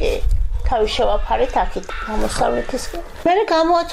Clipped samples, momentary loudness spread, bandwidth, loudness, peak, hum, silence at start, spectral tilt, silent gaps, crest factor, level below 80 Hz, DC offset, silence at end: under 0.1%; 10 LU; 14.5 kHz; -20 LUFS; -8 dBFS; none; 0 s; -5 dB/octave; none; 10 dB; -24 dBFS; under 0.1%; 0 s